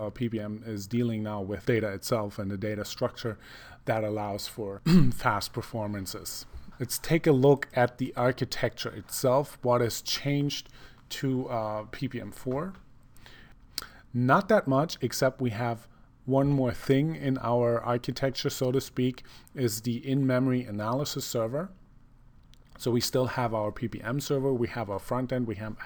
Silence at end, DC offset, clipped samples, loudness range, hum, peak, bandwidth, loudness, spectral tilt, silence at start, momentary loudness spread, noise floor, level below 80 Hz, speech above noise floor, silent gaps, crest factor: 0 s; under 0.1%; under 0.1%; 5 LU; none; -8 dBFS; over 20 kHz; -29 LUFS; -5.5 dB/octave; 0 s; 12 LU; -55 dBFS; -50 dBFS; 26 dB; none; 20 dB